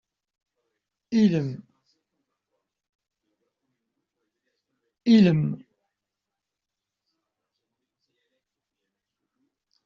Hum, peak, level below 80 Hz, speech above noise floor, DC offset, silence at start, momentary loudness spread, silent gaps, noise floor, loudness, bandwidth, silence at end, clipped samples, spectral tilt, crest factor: none; -8 dBFS; -66 dBFS; 67 dB; under 0.1%; 1.1 s; 18 LU; 2.89-2.99 s; -86 dBFS; -22 LUFS; 7 kHz; 4.3 s; under 0.1%; -7.5 dB/octave; 22 dB